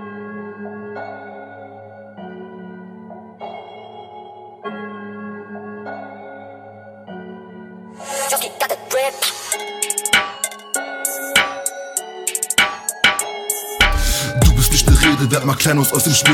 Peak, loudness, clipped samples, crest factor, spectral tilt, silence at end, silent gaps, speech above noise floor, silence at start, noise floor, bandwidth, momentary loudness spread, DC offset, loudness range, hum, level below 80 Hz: 0 dBFS; -17 LUFS; under 0.1%; 20 dB; -3 dB/octave; 0 s; none; 24 dB; 0 s; -39 dBFS; 18 kHz; 23 LU; under 0.1%; 19 LU; none; -26 dBFS